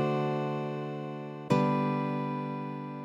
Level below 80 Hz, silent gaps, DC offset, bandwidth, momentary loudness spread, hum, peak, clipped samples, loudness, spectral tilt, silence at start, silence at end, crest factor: -70 dBFS; none; under 0.1%; 9 kHz; 11 LU; none; -12 dBFS; under 0.1%; -32 LUFS; -8 dB/octave; 0 s; 0 s; 18 dB